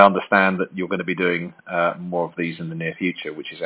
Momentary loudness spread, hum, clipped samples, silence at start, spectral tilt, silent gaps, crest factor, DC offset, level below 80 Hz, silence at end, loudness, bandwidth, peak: 10 LU; none; under 0.1%; 0 s; -9.5 dB/octave; none; 22 dB; under 0.1%; -62 dBFS; 0 s; -22 LUFS; 4 kHz; 0 dBFS